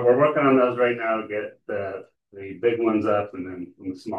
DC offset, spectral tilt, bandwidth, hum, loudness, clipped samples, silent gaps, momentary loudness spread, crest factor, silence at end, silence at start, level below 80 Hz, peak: under 0.1%; -8 dB/octave; 6.8 kHz; none; -23 LUFS; under 0.1%; none; 17 LU; 16 dB; 0 s; 0 s; -70 dBFS; -6 dBFS